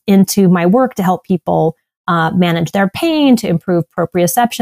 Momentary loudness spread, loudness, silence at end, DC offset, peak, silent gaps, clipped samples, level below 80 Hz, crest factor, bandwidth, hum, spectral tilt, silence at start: 6 LU; -13 LUFS; 0 s; under 0.1%; -2 dBFS; 1.97-2.04 s; under 0.1%; -50 dBFS; 12 dB; 16 kHz; none; -6 dB/octave; 0.05 s